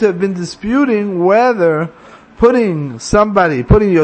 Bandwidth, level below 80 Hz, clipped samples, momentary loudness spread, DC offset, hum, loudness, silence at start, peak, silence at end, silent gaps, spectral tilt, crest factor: 8.8 kHz; -28 dBFS; under 0.1%; 8 LU; under 0.1%; none; -13 LUFS; 0 s; 0 dBFS; 0 s; none; -7 dB/octave; 12 dB